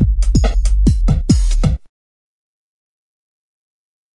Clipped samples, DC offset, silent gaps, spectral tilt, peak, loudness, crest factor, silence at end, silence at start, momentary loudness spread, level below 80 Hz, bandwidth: under 0.1%; under 0.1%; none; -6.5 dB/octave; 0 dBFS; -16 LUFS; 16 dB; 2.35 s; 0 s; 4 LU; -18 dBFS; 11 kHz